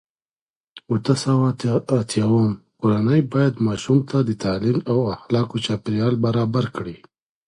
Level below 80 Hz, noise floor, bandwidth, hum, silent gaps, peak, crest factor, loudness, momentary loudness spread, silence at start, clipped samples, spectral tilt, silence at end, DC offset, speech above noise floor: -52 dBFS; under -90 dBFS; 11.5 kHz; none; none; -4 dBFS; 18 dB; -21 LUFS; 6 LU; 0.75 s; under 0.1%; -7 dB/octave; 0.5 s; under 0.1%; over 70 dB